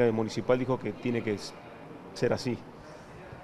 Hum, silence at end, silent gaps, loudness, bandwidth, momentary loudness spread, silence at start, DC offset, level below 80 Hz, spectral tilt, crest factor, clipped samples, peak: none; 0 s; none; -31 LUFS; 13 kHz; 19 LU; 0 s; under 0.1%; -58 dBFS; -6.5 dB/octave; 20 dB; under 0.1%; -10 dBFS